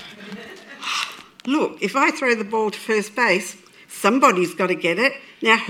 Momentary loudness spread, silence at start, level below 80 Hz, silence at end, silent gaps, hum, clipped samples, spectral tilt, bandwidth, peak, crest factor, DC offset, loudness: 19 LU; 0 s; -74 dBFS; 0 s; none; none; under 0.1%; -3.5 dB/octave; 18.5 kHz; -2 dBFS; 20 dB; under 0.1%; -20 LUFS